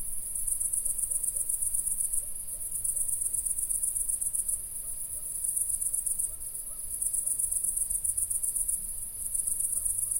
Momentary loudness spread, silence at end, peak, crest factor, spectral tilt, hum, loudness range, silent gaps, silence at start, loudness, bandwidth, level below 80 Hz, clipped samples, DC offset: 7 LU; 0 s; -12 dBFS; 20 dB; -0.5 dB/octave; none; 1 LU; none; 0 s; -28 LUFS; 16.5 kHz; -50 dBFS; under 0.1%; under 0.1%